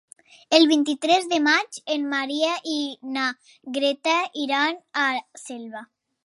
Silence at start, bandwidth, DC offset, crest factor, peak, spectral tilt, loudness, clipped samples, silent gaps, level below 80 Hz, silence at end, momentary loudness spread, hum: 0.5 s; 11.5 kHz; under 0.1%; 22 dB; 0 dBFS; -1.5 dB/octave; -22 LUFS; under 0.1%; none; -80 dBFS; 0.4 s; 17 LU; none